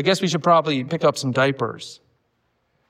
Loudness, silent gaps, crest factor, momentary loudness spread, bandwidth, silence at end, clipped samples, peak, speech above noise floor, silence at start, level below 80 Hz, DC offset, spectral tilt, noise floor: -20 LUFS; none; 18 dB; 12 LU; 15 kHz; 0.95 s; under 0.1%; -4 dBFS; 49 dB; 0 s; -68 dBFS; under 0.1%; -5 dB/octave; -69 dBFS